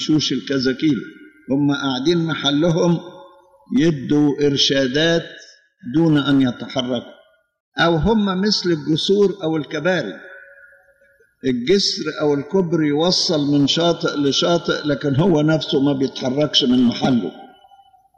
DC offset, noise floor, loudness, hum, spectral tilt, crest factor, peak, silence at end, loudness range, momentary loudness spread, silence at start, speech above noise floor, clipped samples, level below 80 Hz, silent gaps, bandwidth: under 0.1%; -56 dBFS; -18 LUFS; none; -5 dB/octave; 16 dB; -2 dBFS; 0.7 s; 3 LU; 8 LU; 0 s; 39 dB; under 0.1%; -46 dBFS; 7.60-7.72 s; 9 kHz